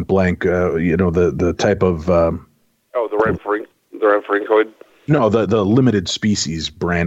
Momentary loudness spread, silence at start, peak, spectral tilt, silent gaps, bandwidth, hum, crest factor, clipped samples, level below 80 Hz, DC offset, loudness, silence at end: 9 LU; 0 s; -4 dBFS; -6 dB/octave; none; 8.2 kHz; none; 14 dB; under 0.1%; -40 dBFS; under 0.1%; -17 LUFS; 0 s